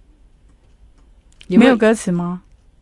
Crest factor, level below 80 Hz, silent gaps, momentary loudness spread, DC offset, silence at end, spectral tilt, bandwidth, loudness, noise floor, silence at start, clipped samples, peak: 18 dB; -48 dBFS; none; 15 LU; under 0.1%; 0.4 s; -6 dB/octave; 11.5 kHz; -15 LUFS; -50 dBFS; 1.5 s; under 0.1%; 0 dBFS